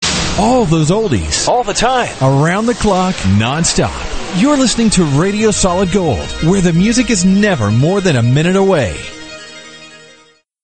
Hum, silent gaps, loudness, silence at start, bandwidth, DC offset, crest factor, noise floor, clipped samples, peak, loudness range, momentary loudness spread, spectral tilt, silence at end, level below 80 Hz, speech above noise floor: none; none; -12 LUFS; 0 s; 9.2 kHz; 0.2%; 12 dB; -48 dBFS; under 0.1%; 0 dBFS; 1 LU; 9 LU; -5 dB/octave; 0.65 s; -30 dBFS; 36 dB